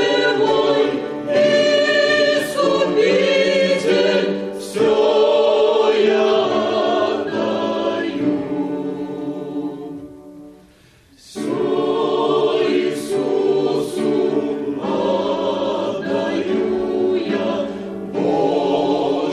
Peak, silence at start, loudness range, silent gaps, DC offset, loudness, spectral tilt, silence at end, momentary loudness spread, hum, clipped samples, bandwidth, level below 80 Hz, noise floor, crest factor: -6 dBFS; 0 s; 8 LU; none; under 0.1%; -18 LUFS; -5 dB/octave; 0 s; 11 LU; none; under 0.1%; 13.5 kHz; -58 dBFS; -50 dBFS; 12 dB